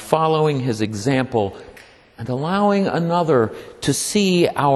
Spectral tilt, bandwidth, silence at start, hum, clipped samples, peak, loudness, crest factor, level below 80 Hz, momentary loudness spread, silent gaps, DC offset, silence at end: -5.5 dB/octave; 13.5 kHz; 0 s; none; under 0.1%; 0 dBFS; -19 LUFS; 18 dB; -54 dBFS; 9 LU; none; under 0.1%; 0 s